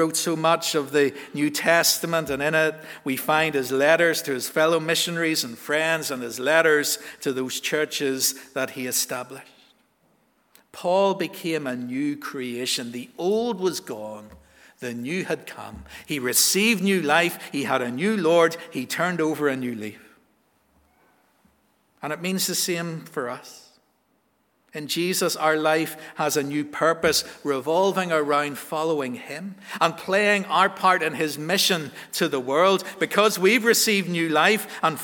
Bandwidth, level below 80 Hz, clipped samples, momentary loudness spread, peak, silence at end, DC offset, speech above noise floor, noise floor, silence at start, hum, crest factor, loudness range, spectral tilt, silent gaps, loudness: over 20 kHz; -64 dBFS; under 0.1%; 12 LU; -2 dBFS; 0 s; under 0.1%; 44 dB; -67 dBFS; 0 s; none; 22 dB; 8 LU; -3 dB/octave; none; -23 LUFS